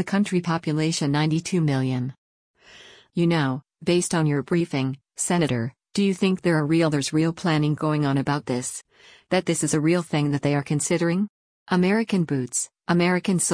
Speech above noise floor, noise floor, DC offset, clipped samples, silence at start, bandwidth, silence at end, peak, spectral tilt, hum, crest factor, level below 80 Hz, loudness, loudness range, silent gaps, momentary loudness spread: 27 dB; -49 dBFS; under 0.1%; under 0.1%; 0 s; 10.5 kHz; 0 s; -8 dBFS; -5.5 dB/octave; none; 16 dB; -60 dBFS; -23 LUFS; 2 LU; 2.18-2.54 s, 11.29-11.66 s; 7 LU